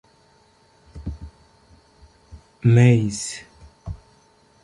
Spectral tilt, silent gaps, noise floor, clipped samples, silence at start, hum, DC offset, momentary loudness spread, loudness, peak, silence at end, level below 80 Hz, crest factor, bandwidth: -6.5 dB/octave; none; -57 dBFS; under 0.1%; 0.95 s; none; under 0.1%; 26 LU; -18 LUFS; -2 dBFS; 0.7 s; -44 dBFS; 20 dB; 11.5 kHz